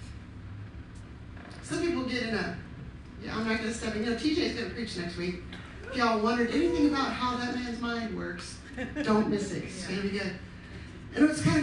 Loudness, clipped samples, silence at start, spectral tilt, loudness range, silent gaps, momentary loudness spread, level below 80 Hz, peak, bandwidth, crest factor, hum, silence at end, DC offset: -30 LUFS; under 0.1%; 0 s; -5.5 dB/octave; 4 LU; none; 18 LU; -50 dBFS; -12 dBFS; 11.5 kHz; 18 dB; none; 0 s; under 0.1%